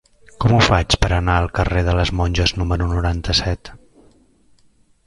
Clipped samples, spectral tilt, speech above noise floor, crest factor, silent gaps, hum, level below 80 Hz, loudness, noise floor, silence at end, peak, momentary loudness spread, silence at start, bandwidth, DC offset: under 0.1%; -5 dB/octave; 38 dB; 18 dB; none; none; -26 dBFS; -18 LUFS; -55 dBFS; 1.3 s; 0 dBFS; 6 LU; 0.4 s; 11.5 kHz; under 0.1%